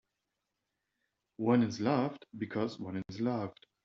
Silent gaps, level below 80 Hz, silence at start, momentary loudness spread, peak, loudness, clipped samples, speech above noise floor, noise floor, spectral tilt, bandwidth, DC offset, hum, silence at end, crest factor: none; -74 dBFS; 1.4 s; 12 LU; -16 dBFS; -34 LUFS; under 0.1%; 53 dB; -86 dBFS; -6.5 dB/octave; 7.4 kHz; under 0.1%; none; 0.35 s; 20 dB